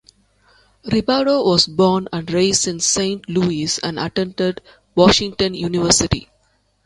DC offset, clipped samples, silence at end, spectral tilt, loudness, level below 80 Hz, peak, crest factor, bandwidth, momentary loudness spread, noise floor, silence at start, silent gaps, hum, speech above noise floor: under 0.1%; under 0.1%; 0.6 s; -3.5 dB/octave; -17 LUFS; -42 dBFS; 0 dBFS; 18 dB; 11.5 kHz; 9 LU; -62 dBFS; 0.85 s; none; none; 44 dB